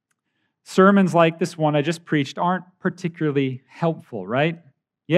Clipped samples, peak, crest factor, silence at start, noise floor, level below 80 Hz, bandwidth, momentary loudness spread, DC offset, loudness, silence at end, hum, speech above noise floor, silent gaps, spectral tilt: under 0.1%; -2 dBFS; 20 dB; 0.7 s; -74 dBFS; -80 dBFS; 12 kHz; 11 LU; under 0.1%; -21 LUFS; 0 s; none; 53 dB; none; -6.5 dB/octave